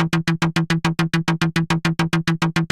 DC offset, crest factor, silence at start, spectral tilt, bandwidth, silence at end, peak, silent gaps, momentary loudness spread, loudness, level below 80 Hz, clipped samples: under 0.1%; 12 dB; 0 s; -5.5 dB/octave; 12.5 kHz; 0.05 s; -8 dBFS; none; 1 LU; -20 LUFS; -46 dBFS; under 0.1%